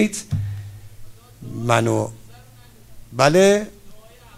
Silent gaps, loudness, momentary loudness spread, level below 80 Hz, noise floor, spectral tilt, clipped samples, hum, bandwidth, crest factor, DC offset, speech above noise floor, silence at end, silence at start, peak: none; -19 LUFS; 21 LU; -46 dBFS; -46 dBFS; -5 dB/octave; under 0.1%; none; 16 kHz; 22 dB; under 0.1%; 28 dB; 0.35 s; 0 s; 0 dBFS